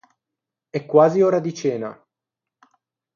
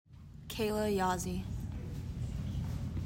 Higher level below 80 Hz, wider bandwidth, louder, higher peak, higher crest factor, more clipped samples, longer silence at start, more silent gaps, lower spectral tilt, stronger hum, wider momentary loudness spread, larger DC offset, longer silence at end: second, -72 dBFS vs -46 dBFS; second, 7.2 kHz vs 16 kHz; first, -19 LUFS vs -37 LUFS; first, -2 dBFS vs -22 dBFS; about the same, 20 dB vs 16 dB; neither; first, 0.75 s vs 0.1 s; neither; about the same, -7 dB/octave vs -6 dB/octave; neither; first, 15 LU vs 11 LU; neither; first, 1.2 s vs 0 s